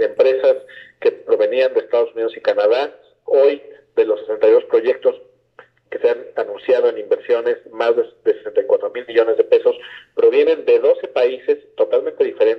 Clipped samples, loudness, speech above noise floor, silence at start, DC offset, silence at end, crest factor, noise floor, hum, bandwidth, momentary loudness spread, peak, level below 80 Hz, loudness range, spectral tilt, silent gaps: under 0.1%; -17 LUFS; 32 dB; 0 s; under 0.1%; 0 s; 14 dB; -49 dBFS; none; 5.8 kHz; 8 LU; -2 dBFS; -72 dBFS; 3 LU; -5 dB/octave; none